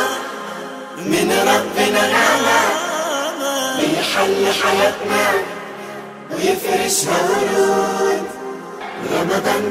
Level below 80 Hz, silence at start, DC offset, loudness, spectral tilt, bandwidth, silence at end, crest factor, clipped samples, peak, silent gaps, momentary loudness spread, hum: -58 dBFS; 0 s; under 0.1%; -17 LUFS; -2.5 dB/octave; 16 kHz; 0 s; 16 dB; under 0.1%; -2 dBFS; none; 15 LU; none